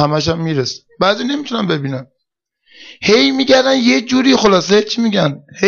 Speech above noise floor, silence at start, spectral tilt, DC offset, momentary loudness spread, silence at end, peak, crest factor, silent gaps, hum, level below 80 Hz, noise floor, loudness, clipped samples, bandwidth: 60 dB; 0 s; -4.5 dB/octave; under 0.1%; 9 LU; 0 s; -2 dBFS; 12 dB; none; none; -48 dBFS; -74 dBFS; -14 LUFS; under 0.1%; 7.2 kHz